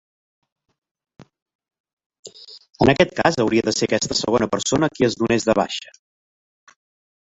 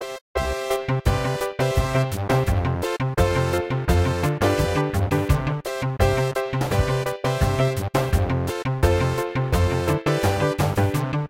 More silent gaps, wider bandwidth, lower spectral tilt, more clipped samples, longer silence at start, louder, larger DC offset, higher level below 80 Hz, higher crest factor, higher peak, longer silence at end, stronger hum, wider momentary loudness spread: first, 1.42-1.46 s, 1.55-1.59 s, 1.80-1.84 s, 1.93-1.97 s, 2.06-2.10 s, 2.19-2.23 s vs 0.21-0.34 s; second, 8.2 kHz vs 16.5 kHz; second, -4.5 dB/octave vs -6 dB/octave; neither; first, 1.2 s vs 0 s; first, -19 LUFS vs -23 LUFS; neither; second, -50 dBFS vs -32 dBFS; about the same, 20 dB vs 16 dB; first, -2 dBFS vs -6 dBFS; first, 1.45 s vs 0 s; neither; first, 11 LU vs 4 LU